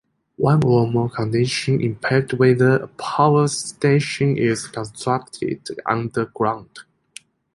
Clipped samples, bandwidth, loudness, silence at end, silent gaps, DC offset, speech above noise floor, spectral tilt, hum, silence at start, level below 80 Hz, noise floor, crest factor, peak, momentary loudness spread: under 0.1%; 11.5 kHz; -20 LUFS; 0.75 s; none; under 0.1%; 27 dB; -6 dB/octave; none; 0.4 s; -54 dBFS; -46 dBFS; 18 dB; -2 dBFS; 10 LU